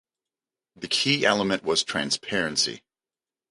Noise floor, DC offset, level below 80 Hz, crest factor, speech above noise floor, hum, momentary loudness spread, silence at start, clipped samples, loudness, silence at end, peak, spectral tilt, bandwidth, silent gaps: under -90 dBFS; under 0.1%; -64 dBFS; 22 dB; over 65 dB; none; 6 LU; 0.8 s; under 0.1%; -24 LUFS; 0.75 s; -4 dBFS; -2.5 dB/octave; 11.5 kHz; none